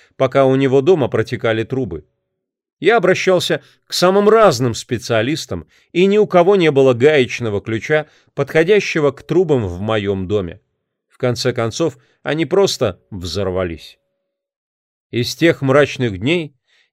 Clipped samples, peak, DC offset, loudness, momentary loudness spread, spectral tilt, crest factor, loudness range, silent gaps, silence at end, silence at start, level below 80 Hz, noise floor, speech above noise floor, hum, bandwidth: under 0.1%; 0 dBFS; under 0.1%; -16 LUFS; 11 LU; -5.5 dB/octave; 16 dB; 6 LU; 2.73-2.77 s, 14.56-15.10 s; 0.45 s; 0.2 s; -50 dBFS; -77 dBFS; 61 dB; none; 15 kHz